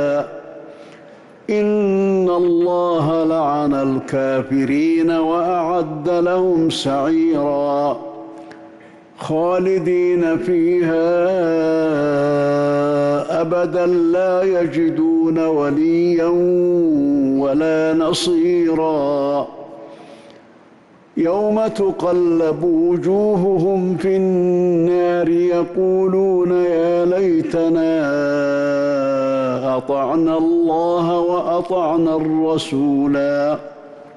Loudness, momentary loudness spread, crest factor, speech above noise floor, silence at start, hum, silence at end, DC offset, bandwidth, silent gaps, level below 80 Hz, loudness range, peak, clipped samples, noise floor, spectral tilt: -17 LUFS; 4 LU; 8 dB; 31 dB; 0 s; none; 0.05 s; under 0.1%; 11.5 kHz; none; -54 dBFS; 3 LU; -10 dBFS; under 0.1%; -47 dBFS; -7 dB/octave